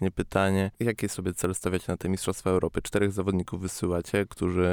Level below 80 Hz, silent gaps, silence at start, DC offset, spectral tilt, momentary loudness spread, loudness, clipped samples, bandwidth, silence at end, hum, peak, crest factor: -48 dBFS; none; 0 s; under 0.1%; -5.5 dB/octave; 4 LU; -28 LUFS; under 0.1%; 19.5 kHz; 0 s; none; -8 dBFS; 18 dB